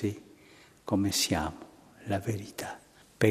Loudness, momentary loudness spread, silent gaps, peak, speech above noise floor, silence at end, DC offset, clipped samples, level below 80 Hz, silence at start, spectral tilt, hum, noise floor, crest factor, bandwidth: -31 LUFS; 21 LU; none; -8 dBFS; 26 dB; 0 s; under 0.1%; under 0.1%; -54 dBFS; 0 s; -4.5 dB/octave; none; -57 dBFS; 24 dB; 15.5 kHz